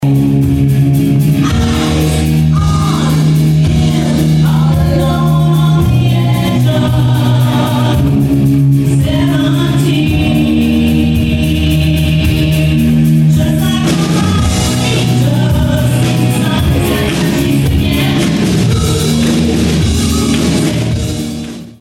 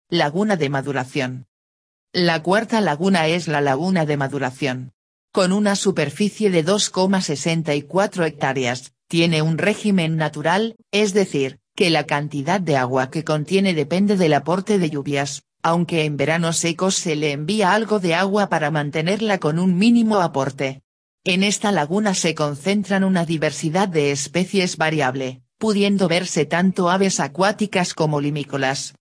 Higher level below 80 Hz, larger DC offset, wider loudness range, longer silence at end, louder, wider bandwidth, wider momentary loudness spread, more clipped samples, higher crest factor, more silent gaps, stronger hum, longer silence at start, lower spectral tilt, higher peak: first, -22 dBFS vs -64 dBFS; neither; about the same, 1 LU vs 1 LU; about the same, 0.05 s vs 0.1 s; first, -11 LUFS vs -20 LUFS; first, 16.5 kHz vs 11 kHz; second, 2 LU vs 6 LU; neither; second, 8 dB vs 16 dB; second, none vs 1.48-2.07 s, 4.94-5.28 s, 20.84-21.18 s; neither; about the same, 0 s vs 0.1 s; about the same, -6 dB/octave vs -5 dB/octave; about the same, -2 dBFS vs -2 dBFS